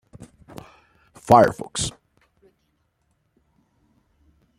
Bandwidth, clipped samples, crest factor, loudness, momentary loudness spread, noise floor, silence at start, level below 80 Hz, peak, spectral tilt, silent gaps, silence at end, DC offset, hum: 16 kHz; under 0.1%; 24 dB; -19 LUFS; 28 LU; -70 dBFS; 1.25 s; -52 dBFS; -2 dBFS; -4.5 dB/octave; none; 2.7 s; under 0.1%; none